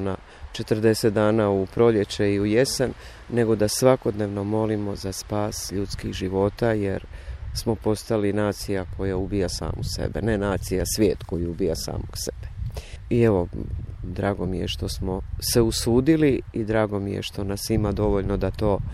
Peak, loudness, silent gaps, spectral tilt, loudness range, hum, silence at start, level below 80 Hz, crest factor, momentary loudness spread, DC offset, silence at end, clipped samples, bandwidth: -4 dBFS; -24 LUFS; none; -5.5 dB/octave; 5 LU; none; 0 s; -38 dBFS; 18 dB; 11 LU; under 0.1%; 0 s; under 0.1%; 15.5 kHz